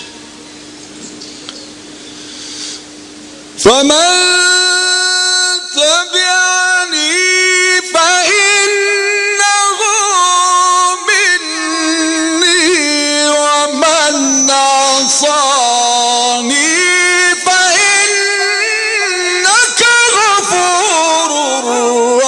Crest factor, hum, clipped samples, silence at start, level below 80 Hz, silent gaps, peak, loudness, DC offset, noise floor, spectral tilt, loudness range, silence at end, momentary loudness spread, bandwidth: 12 dB; none; under 0.1%; 0 s; -56 dBFS; none; 0 dBFS; -9 LUFS; under 0.1%; -32 dBFS; 0.5 dB/octave; 2 LU; 0 s; 15 LU; 12 kHz